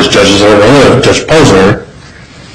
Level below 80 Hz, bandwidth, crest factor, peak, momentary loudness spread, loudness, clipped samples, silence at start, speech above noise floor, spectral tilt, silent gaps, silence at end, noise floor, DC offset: -28 dBFS; 14.5 kHz; 6 dB; 0 dBFS; 4 LU; -5 LUFS; 0.9%; 0 s; 27 dB; -4.5 dB/octave; none; 0.15 s; -31 dBFS; under 0.1%